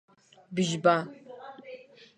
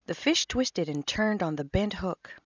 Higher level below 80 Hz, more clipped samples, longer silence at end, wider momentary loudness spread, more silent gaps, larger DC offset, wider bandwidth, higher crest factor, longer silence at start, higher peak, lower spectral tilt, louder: second, -74 dBFS vs -46 dBFS; neither; first, 0.4 s vs 0.2 s; first, 22 LU vs 8 LU; neither; neither; first, 10.5 kHz vs 7.8 kHz; about the same, 22 dB vs 18 dB; first, 0.5 s vs 0.1 s; first, -8 dBFS vs -12 dBFS; about the same, -5 dB/octave vs -4 dB/octave; about the same, -27 LUFS vs -28 LUFS